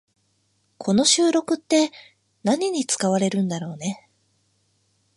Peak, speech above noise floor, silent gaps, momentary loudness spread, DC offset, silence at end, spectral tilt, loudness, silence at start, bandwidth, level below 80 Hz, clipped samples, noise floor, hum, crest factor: -6 dBFS; 46 dB; none; 14 LU; under 0.1%; 1.2 s; -4 dB/octave; -22 LUFS; 0.8 s; 11.5 kHz; -68 dBFS; under 0.1%; -68 dBFS; none; 18 dB